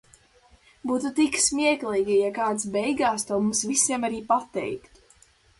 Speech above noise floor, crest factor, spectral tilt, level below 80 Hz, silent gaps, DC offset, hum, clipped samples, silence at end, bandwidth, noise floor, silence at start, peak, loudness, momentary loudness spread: 34 dB; 18 dB; -2.5 dB/octave; -60 dBFS; none; under 0.1%; none; under 0.1%; 0.8 s; 11.5 kHz; -58 dBFS; 0.85 s; -6 dBFS; -24 LUFS; 10 LU